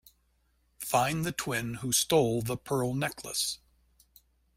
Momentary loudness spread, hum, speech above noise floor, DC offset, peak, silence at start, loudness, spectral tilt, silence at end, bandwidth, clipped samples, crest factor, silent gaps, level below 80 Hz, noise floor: 8 LU; none; 41 dB; under 0.1%; -12 dBFS; 0.8 s; -29 LUFS; -3.5 dB/octave; 1 s; 16 kHz; under 0.1%; 20 dB; none; -60 dBFS; -71 dBFS